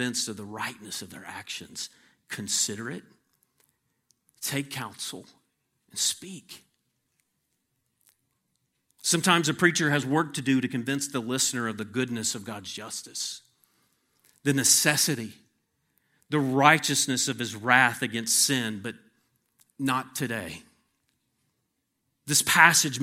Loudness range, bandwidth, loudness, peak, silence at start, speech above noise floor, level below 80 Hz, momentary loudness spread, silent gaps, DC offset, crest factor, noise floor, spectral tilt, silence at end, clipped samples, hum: 12 LU; 16.5 kHz; -25 LUFS; 0 dBFS; 0 s; 52 dB; -72 dBFS; 18 LU; none; under 0.1%; 28 dB; -78 dBFS; -2.5 dB/octave; 0 s; under 0.1%; none